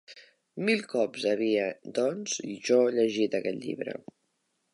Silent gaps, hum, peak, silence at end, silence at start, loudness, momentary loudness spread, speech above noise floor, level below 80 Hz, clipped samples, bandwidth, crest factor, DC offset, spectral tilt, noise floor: none; none; -12 dBFS; 0.75 s; 0.1 s; -28 LUFS; 11 LU; 48 dB; -80 dBFS; under 0.1%; 11.5 kHz; 18 dB; under 0.1%; -4 dB/octave; -76 dBFS